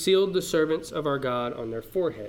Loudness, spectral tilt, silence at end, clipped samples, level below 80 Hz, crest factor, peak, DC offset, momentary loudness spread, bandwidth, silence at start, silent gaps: -27 LUFS; -5 dB/octave; 0 s; under 0.1%; -56 dBFS; 16 dB; -10 dBFS; under 0.1%; 8 LU; 17 kHz; 0 s; none